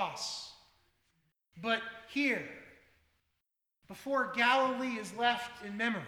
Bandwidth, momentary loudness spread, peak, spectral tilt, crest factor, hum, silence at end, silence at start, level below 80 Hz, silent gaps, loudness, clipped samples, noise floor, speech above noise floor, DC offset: 19.5 kHz; 19 LU; -14 dBFS; -3 dB/octave; 22 dB; none; 0 s; 0 s; -76 dBFS; none; -33 LUFS; under 0.1%; -85 dBFS; 52 dB; under 0.1%